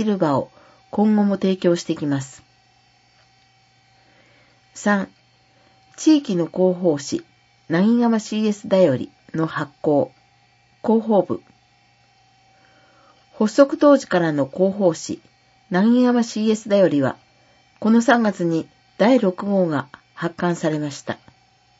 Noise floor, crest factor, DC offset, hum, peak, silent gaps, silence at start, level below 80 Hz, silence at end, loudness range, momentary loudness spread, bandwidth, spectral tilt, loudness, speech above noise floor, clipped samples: -57 dBFS; 20 dB; under 0.1%; none; 0 dBFS; none; 0 s; -66 dBFS; 0.65 s; 7 LU; 13 LU; 8 kHz; -6.5 dB/octave; -20 LUFS; 39 dB; under 0.1%